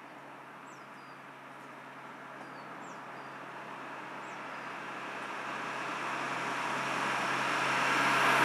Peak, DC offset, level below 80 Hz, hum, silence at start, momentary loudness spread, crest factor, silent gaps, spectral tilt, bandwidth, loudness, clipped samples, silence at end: -14 dBFS; under 0.1%; under -90 dBFS; none; 0 s; 20 LU; 22 dB; none; -3 dB/octave; 16.5 kHz; -34 LUFS; under 0.1%; 0 s